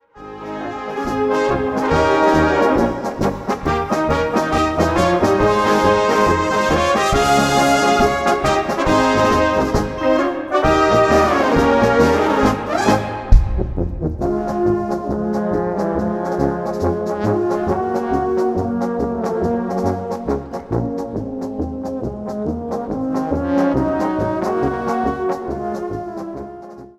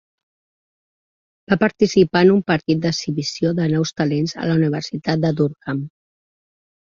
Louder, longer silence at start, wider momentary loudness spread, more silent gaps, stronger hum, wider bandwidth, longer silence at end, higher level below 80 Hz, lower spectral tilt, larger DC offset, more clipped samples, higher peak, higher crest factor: about the same, -18 LUFS vs -19 LUFS; second, 0.15 s vs 1.5 s; about the same, 11 LU vs 9 LU; neither; neither; first, 14.5 kHz vs 7.6 kHz; second, 0.1 s vs 0.95 s; first, -28 dBFS vs -54 dBFS; about the same, -5.5 dB/octave vs -6 dB/octave; neither; neither; about the same, -2 dBFS vs -2 dBFS; about the same, 16 dB vs 18 dB